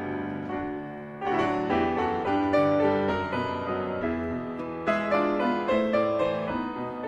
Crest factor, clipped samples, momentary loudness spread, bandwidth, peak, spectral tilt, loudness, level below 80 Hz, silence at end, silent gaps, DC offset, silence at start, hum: 14 dB; under 0.1%; 9 LU; 9.4 kHz; -12 dBFS; -7.5 dB/octave; -27 LUFS; -56 dBFS; 0 s; none; under 0.1%; 0 s; none